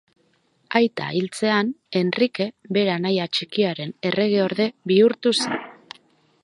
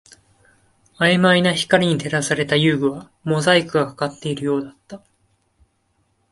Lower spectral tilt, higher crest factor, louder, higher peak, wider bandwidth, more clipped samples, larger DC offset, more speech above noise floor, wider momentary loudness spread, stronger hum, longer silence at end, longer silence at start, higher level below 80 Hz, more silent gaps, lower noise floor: about the same, -5 dB/octave vs -5 dB/octave; about the same, 20 dB vs 20 dB; second, -22 LUFS vs -18 LUFS; about the same, -2 dBFS vs 0 dBFS; about the same, 11.5 kHz vs 11.5 kHz; neither; neither; second, 43 dB vs 47 dB; about the same, 8 LU vs 10 LU; neither; second, 0.7 s vs 1.35 s; second, 0.7 s vs 1 s; second, -70 dBFS vs -58 dBFS; neither; about the same, -64 dBFS vs -66 dBFS